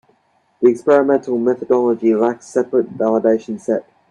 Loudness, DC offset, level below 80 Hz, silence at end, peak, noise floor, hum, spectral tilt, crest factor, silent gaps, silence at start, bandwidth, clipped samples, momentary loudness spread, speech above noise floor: -17 LUFS; under 0.1%; -64 dBFS; 0.3 s; 0 dBFS; -60 dBFS; none; -7 dB/octave; 16 dB; none; 0.6 s; 9.8 kHz; under 0.1%; 8 LU; 44 dB